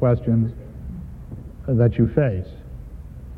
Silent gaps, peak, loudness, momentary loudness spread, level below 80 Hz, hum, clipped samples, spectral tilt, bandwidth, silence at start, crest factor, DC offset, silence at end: none; -4 dBFS; -21 LUFS; 21 LU; -38 dBFS; none; under 0.1%; -11.5 dB/octave; 3.7 kHz; 0 s; 18 dB; under 0.1%; 0 s